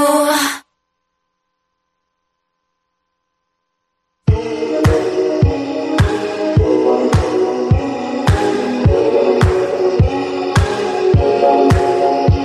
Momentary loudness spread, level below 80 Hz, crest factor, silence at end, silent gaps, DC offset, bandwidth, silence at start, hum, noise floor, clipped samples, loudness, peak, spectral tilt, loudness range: 6 LU; -28 dBFS; 12 dB; 0 s; none; under 0.1%; 14 kHz; 0 s; none; -72 dBFS; under 0.1%; -15 LUFS; -2 dBFS; -6.5 dB/octave; 9 LU